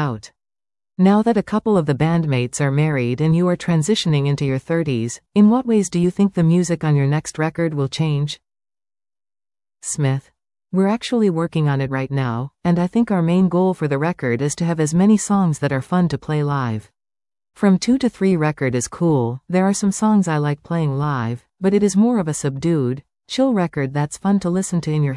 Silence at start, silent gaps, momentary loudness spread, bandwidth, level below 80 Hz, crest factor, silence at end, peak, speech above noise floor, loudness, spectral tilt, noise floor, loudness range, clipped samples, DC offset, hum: 0 s; none; 7 LU; 12 kHz; -52 dBFS; 14 dB; 0 s; -4 dBFS; over 72 dB; -19 LUFS; -6.5 dB/octave; under -90 dBFS; 4 LU; under 0.1%; under 0.1%; none